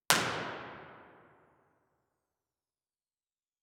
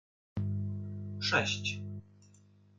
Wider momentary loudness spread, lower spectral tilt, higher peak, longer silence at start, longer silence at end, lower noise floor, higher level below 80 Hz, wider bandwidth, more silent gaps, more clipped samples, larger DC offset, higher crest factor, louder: first, 25 LU vs 14 LU; second, -1.5 dB/octave vs -4 dB/octave; first, 0 dBFS vs -14 dBFS; second, 0.1 s vs 0.35 s; first, 2.55 s vs 0.55 s; first, under -90 dBFS vs -62 dBFS; second, -74 dBFS vs -68 dBFS; first, 18 kHz vs 7.8 kHz; neither; neither; neither; first, 40 dB vs 22 dB; about the same, -33 LUFS vs -34 LUFS